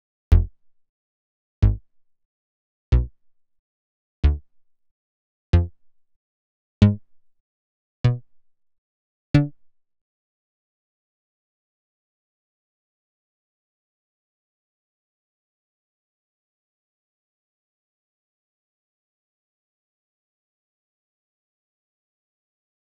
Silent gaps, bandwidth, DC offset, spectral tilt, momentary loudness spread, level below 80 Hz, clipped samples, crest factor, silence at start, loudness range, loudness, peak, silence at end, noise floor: 0.89-1.62 s, 2.25-2.92 s, 3.59-4.23 s, 4.91-5.53 s, 6.16-6.81 s, 7.40-8.04 s, 8.78-9.34 s; 2.6 kHz; 0.1%; -9.5 dB/octave; 14 LU; -32 dBFS; under 0.1%; 28 dB; 0.3 s; 5 LU; -23 LUFS; 0 dBFS; 13.3 s; -57 dBFS